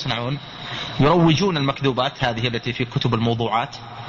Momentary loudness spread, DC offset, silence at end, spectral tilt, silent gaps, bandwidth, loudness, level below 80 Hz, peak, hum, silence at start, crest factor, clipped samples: 12 LU; under 0.1%; 0 s; -6.5 dB/octave; none; 7.4 kHz; -21 LUFS; -46 dBFS; -6 dBFS; none; 0 s; 16 dB; under 0.1%